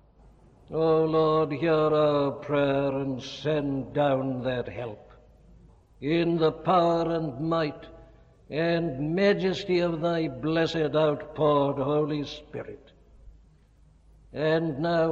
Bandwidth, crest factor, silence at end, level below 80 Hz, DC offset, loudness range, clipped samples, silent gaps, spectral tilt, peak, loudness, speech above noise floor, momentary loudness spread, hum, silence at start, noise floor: 7.6 kHz; 16 dB; 0 s; -54 dBFS; under 0.1%; 5 LU; under 0.1%; none; -7.5 dB/octave; -10 dBFS; -26 LUFS; 32 dB; 12 LU; none; 0.7 s; -58 dBFS